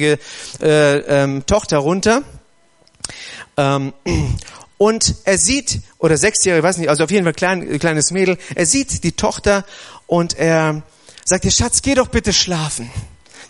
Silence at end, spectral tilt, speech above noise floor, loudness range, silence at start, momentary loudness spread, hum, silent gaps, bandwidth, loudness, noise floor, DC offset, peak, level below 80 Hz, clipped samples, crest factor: 0.05 s; -3.5 dB/octave; 39 dB; 4 LU; 0 s; 12 LU; none; none; 11.5 kHz; -16 LUFS; -55 dBFS; under 0.1%; 0 dBFS; -34 dBFS; under 0.1%; 16 dB